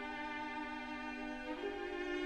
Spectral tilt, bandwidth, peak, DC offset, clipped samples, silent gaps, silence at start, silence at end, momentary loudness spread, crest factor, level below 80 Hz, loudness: -4 dB/octave; 11.5 kHz; -30 dBFS; under 0.1%; under 0.1%; none; 0 s; 0 s; 2 LU; 12 dB; -62 dBFS; -43 LUFS